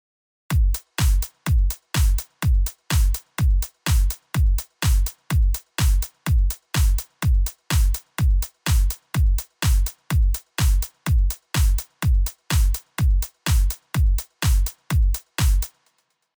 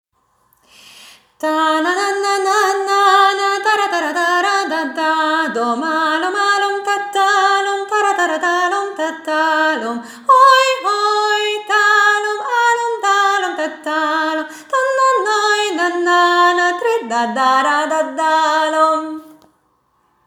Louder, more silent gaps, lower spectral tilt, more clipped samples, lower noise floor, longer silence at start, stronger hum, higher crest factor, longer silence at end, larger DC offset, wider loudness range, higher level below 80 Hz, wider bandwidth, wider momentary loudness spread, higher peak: second, -23 LUFS vs -15 LUFS; neither; first, -4.5 dB/octave vs -1 dB/octave; neither; first, -68 dBFS vs -61 dBFS; second, 0.5 s vs 1 s; neither; second, 10 dB vs 16 dB; second, 0.7 s vs 0.95 s; neither; second, 0 LU vs 3 LU; first, -20 dBFS vs -76 dBFS; about the same, over 20 kHz vs over 20 kHz; second, 3 LU vs 7 LU; second, -10 dBFS vs 0 dBFS